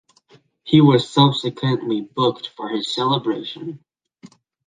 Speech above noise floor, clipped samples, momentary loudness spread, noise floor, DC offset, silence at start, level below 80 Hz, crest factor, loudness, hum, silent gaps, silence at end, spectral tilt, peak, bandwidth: 36 dB; under 0.1%; 16 LU; -55 dBFS; under 0.1%; 0.65 s; -62 dBFS; 18 dB; -19 LUFS; none; none; 0.4 s; -7 dB/octave; -2 dBFS; 9.4 kHz